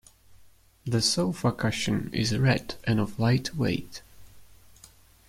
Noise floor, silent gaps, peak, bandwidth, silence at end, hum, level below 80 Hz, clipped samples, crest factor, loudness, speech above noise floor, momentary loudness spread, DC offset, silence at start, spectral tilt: -56 dBFS; none; -8 dBFS; 16 kHz; 0.85 s; none; -52 dBFS; under 0.1%; 20 dB; -27 LUFS; 30 dB; 8 LU; under 0.1%; 0.3 s; -5 dB/octave